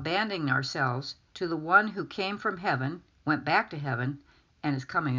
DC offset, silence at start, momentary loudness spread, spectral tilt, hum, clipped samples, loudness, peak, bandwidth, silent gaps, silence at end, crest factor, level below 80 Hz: under 0.1%; 0 s; 12 LU; -6 dB/octave; none; under 0.1%; -29 LUFS; -8 dBFS; 7.6 kHz; none; 0 s; 22 dB; -64 dBFS